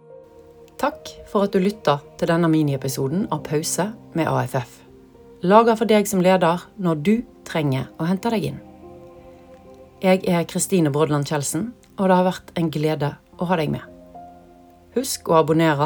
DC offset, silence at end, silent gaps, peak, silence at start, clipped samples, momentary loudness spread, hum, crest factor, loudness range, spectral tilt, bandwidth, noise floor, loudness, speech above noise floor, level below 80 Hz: under 0.1%; 0 s; none; 0 dBFS; 0.1 s; under 0.1%; 11 LU; none; 22 dB; 5 LU; -5.5 dB/octave; over 20 kHz; -48 dBFS; -21 LUFS; 28 dB; -54 dBFS